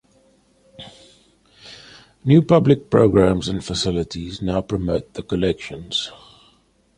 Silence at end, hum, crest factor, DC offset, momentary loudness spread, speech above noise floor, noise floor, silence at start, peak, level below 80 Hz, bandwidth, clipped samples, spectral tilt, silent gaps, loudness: 0.85 s; none; 20 dB; under 0.1%; 26 LU; 40 dB; -59 dBFS; 0.8 s; -2 dBFS; -42 dBFS; 10.5 kHz; under 0.1%; -6.5 dB/octave; none; -19 LUFS